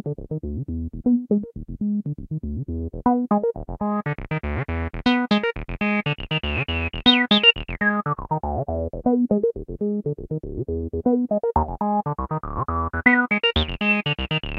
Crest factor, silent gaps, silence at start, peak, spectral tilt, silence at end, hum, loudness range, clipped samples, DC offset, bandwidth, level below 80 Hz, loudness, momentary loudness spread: 22 dB; none; 0.05 s; 0 dBFS; -7.5 dB/octave; 0 s; none; 6 LU; under 0.1%; under 0.1%; 6.6 kHz; -38 dBFS; -22 LUFS; 12 LU